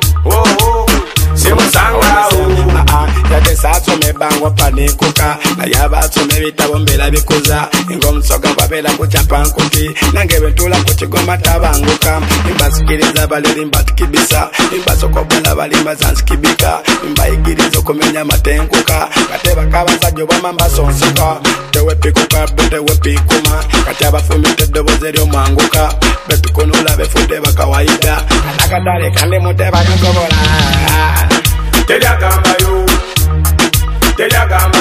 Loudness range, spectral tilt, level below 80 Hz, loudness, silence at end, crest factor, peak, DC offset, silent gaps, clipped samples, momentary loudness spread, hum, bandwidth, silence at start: 2 LU; -4 dB/octave; -14 dBFS; -10 LUFS; 0 s; 10 dB; 0 dBFS; under 0.1%; none; under 0.1%; 3 LU; none; 16 kHz; 0 s